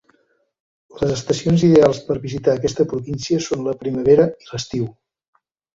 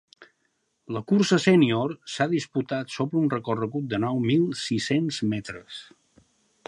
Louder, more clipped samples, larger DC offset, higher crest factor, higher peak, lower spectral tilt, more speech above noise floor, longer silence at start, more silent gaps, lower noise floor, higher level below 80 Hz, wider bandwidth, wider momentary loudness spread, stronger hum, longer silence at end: first, -19 LUFS vs -25 LUFS; neither; neither; about the same, 18 dB vs 20 dB; first, -2 dBFS vs -6 dBFS; about the same, -6.5 dB/octave vs -6 dB/octave; about the same, 46 dB vs 49 dB; first, 0.95 s vs 0.2 s; neither; second, -63 dBFS vs -73 dBFS; first, -48 dBFS vs -64 dBFS; second, 7.8 kHz vs 11.5 kHz; about the same, 12 LU vs 14 LU; neither; about the same, 0.85 s vs 0.85 s